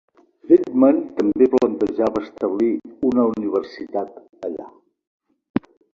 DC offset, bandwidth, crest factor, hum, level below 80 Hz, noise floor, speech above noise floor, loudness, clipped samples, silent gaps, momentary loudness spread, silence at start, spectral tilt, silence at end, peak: under 0.1%; 7.2 kHz; 18 dB; none; -58 dBFS; -40 dBFS; 21 dB; -20 LUFS; under 0.1%; 5.07-5.20 s, 5.50-5.54 s; 14 LU; 0.5 s; -8 dB/octave; 0.35 s; -2 dBFS